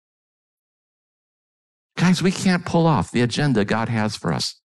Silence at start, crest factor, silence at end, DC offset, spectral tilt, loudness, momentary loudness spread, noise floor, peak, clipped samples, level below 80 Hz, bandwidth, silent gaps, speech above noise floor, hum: 1.95 s; 12 dB; 0.15 s; under 0.1%; -5.5 dB/octave; -20 LUFS; 5 LU; under -90 dBFS; -10 dBFS; under 0.1%; -52 dBFS; 12 kHz; none; over 70 dB; none